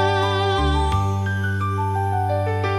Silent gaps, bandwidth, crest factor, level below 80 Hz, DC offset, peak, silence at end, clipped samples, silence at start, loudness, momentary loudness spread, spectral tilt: none; 12.5 kHz; 12 dB; -32 dBFS; under 0.1%; -8 dBFS; 0 s; under 0.1%; 0 s; -21 LUFS; 3 LU; -6 dB/octave